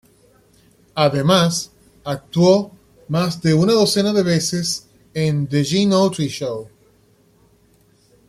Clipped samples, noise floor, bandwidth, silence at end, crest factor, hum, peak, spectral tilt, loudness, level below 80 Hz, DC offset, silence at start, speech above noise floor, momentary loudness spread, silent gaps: under 0.1%; -56 dBFS; 14.5 kHz; 1.6 s; 18 dB; none; -2 dBFS; -5.5 dB/octave; -18 LUFS; -54 dBFS; under 0.1%; 0.95 s; 39 dB; 14 LU; none